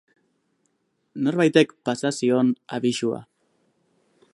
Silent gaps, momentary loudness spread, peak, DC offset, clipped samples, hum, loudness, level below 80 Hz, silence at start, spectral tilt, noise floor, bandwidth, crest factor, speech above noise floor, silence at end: none; 9 LU; -4 dBFS; under 0.1%; under 0.1%; none; -22 LUFS; -72 dBFS; 1.15 s; -5.5 dB/octave; -71 dBFS; 11.5 kHz; 22 dB; 50 dB; 1.1 s